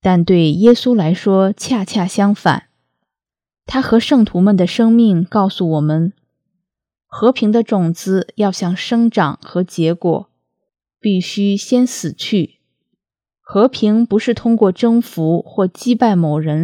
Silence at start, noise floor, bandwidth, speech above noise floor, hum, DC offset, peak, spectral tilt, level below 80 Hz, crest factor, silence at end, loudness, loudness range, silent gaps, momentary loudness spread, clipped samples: 0.05 s; -85 dBFS; 14 kHz; 72 dB; none; under 0.1%; 0 dBFS; -6.5 dB/octave; -52 dBFS; 14 dB; 0 s; -15 LUFS; 4 LU; none; 7 LU; under 0.1%